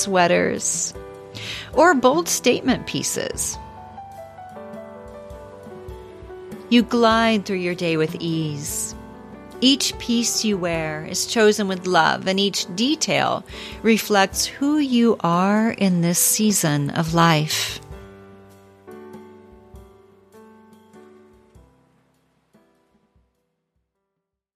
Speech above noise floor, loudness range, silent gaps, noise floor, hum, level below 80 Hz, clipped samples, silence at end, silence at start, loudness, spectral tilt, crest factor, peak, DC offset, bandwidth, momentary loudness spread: 61 dB; 9 LU; none; -81 dBFS; none; -50 dBFS; under 0.1%; 3.55 s; 0 s; -19 LUFS; -3.5 dB/octave; 20 dB; -2 dBFS; under 0.1%; 15.5 kHz; 22 LU